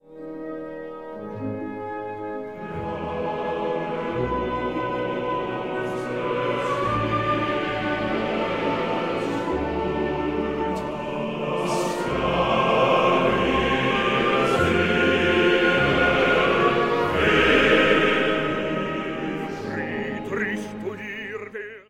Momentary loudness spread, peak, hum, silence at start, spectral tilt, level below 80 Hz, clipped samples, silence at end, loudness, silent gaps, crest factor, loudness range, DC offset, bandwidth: 14 LU; -4 dBFS; none; 0.05 s; -5.5 dB/octave; -44 dBFS; under 0.1%; 0.1 s; -23 LUFS; none; 18 dB; 9 LU; 0.2%; 15.5 kHz